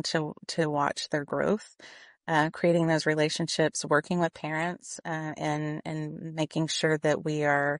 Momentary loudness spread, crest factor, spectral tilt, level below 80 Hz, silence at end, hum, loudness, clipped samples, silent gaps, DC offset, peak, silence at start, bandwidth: 10 LU; 18 dB; -4.5 dB/octave; -68 dBFS; 0 s; none; -28 LUFS; under 0.1%; none; under 0.1%; -10 dBFS; 0.05 s; 10.5 kHz